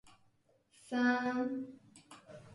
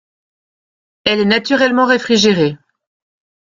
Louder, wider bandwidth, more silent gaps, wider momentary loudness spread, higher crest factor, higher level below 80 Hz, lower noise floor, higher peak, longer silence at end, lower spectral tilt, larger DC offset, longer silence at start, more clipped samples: second, -35 LUFS vs -13 LUFS; first, 11.5 kHz vs 7.6 kHz; neither; first, 24 LU vs 6 LU; about the same, 18 dB vs 16 dB; second, -78 dBFS vs -54 dBFS; second, -72 dBFS vs under -90 dBFS; second, -20 dBFS vs 0 dBFS; second, 0 s vs 0.95 s; about the same, -5 dB/octave vs -4.5 dB/octave; neither; second, 0.85 s vs 1.05 s; neither